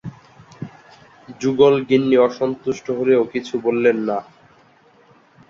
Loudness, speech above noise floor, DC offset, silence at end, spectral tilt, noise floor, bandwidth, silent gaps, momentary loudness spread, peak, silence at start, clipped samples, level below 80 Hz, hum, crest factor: -18 LUFS; 35 dB; under 0.1%; 1.25 s; -6.5 dB/octave; -53 dBFS; 7.4 kHz; none; 22 LU; -2 dBFS; 0.05 s; under 0.1%; -60 dBFS; none; 18 dB